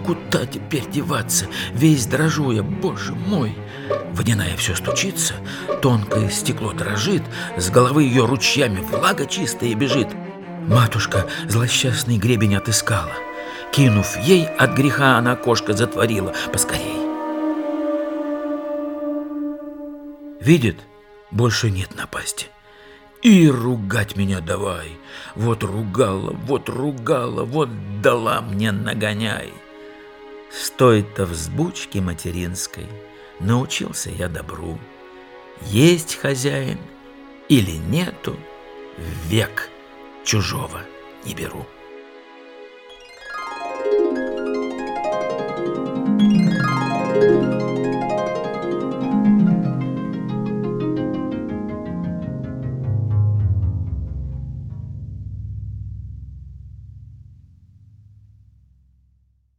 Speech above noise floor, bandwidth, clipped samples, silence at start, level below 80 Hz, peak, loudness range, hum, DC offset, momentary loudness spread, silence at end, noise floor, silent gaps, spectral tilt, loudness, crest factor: 41 dB; 19.5 kHz; under 0.1%; 0 s; -42 dBFS; 0 dBFS; 8 LU; none; under 0.1%; 19 LU; 2.25 s; -60 dBFS; none; -5 dB/octave; -20 LUFS; 20 dB